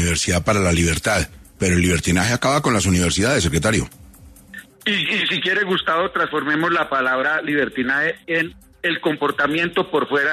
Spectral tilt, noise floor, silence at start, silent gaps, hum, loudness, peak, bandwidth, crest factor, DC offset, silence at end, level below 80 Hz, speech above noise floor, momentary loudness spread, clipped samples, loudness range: -4 dB/octave; -44 dBFS; 0 s; none; none; -19 LUFS; -2 dBFS; 14 kHz; 16 dB; under 0.1%; 0 s; -42 dBFS; 25 dB; 6 LU; under 0.1%; 2 LU